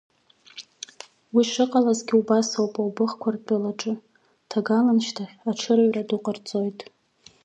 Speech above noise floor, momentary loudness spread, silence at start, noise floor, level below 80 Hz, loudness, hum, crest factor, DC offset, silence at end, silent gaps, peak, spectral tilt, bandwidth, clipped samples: 25 dB; 19 LU; 0.55 s; -47 dBFS; -76 dBFS; -24 LUFS; none; 18 dB; under 0.1%; 0.6 s; none; -8 dBFS; -5 dB/octave; 8.6 kHz; under 0.1%